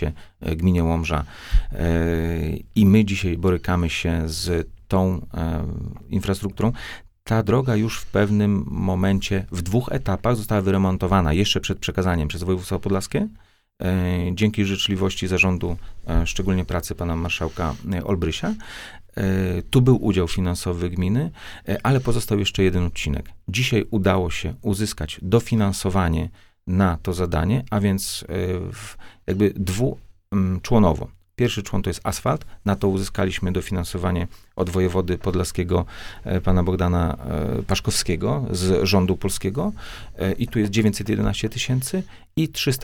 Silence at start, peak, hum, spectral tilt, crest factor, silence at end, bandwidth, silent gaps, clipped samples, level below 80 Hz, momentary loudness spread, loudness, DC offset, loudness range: 0 s; -4 dBFS; none; -6 dB/octave; 18 dB; 0 s; 17.5 kHz; none; under 0.1%; -34 dBFS; 9 LU; -23 LUFS; under 0.1%; 3 LU